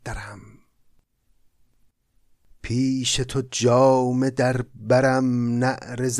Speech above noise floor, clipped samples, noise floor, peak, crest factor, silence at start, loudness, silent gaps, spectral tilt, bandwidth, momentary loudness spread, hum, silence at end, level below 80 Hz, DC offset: 41 dB; under 0.1%; -62 dBFS; -6 dBFS; 16 dB; 0.05 s; -21 LUFS; none; -5 dB/octave; 13 kHz; 13 LU; none; 0 s; -46 dBFS; under 0.1%